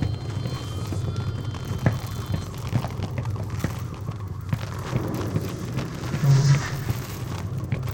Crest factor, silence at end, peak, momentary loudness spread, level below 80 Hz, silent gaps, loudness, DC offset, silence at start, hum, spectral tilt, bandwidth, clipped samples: 20 dB; 0 s; -6 dBFS; 10 LU; -42 dBFS; none; -27 LUFS; under 0.1%; 0 s; none; -6.5 dB/octave; 17 kHz; under 0.1%